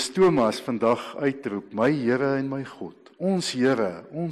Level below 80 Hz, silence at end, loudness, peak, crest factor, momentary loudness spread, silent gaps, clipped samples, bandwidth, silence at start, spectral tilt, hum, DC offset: -64 dBFS; 0 s; -25 LUFS; -12 dBFS; 12 dB; 12 LU; none; under 0.1%; 13 kHz; 0 s; -5.5 dB/octave; none; under 0.1%